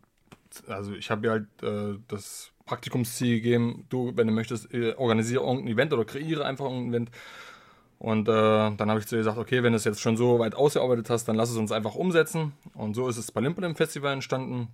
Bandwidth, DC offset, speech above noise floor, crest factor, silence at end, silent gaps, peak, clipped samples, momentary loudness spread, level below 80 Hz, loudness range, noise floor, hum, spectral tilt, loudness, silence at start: 16 kHz; under 0.1%; 30 dB; 18 dB; 0 s; none; -8 dBFS; under 0.1%; 14 LU; -66 dBFS; 4 LU; -57 dBFS; none; -5.5 dB/octave; -27 LUFS; 0.5 s